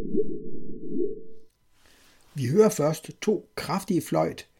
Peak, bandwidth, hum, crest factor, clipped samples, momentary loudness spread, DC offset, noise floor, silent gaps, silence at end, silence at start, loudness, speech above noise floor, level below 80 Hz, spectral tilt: -6 dBFS; 17 kHz; none; 20 dB; under 0.1%; 19 LU; under 0.1%; -59 dBFS; none; 0.15 s; 0 s; -27 LUFS; 34 dB; -54 dBFS; -6 dB/octave